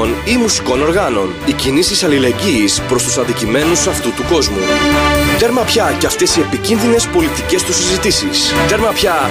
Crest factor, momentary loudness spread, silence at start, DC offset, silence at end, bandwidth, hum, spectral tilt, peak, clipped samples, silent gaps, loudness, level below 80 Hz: 12 dB; 3 LU; 0 s; under 0.1%; 0 s; 15.5 kHz; none; -3.5 dB/octave; -2 dBFS; under 0.1%; none; -12 LUFS; -30 dBFS